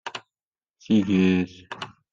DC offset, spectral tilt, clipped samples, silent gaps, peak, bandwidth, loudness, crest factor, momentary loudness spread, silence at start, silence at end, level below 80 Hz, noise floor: under 0.1%; -7 dB/octave; under 0.1%; 0.47-0.51 s; -10 dBFS; 7.6 kHz; -22 LUFS; 16 dB; 17 LU; 0.05 s; 0.25 s; -64 dBFS; under -90 dBFS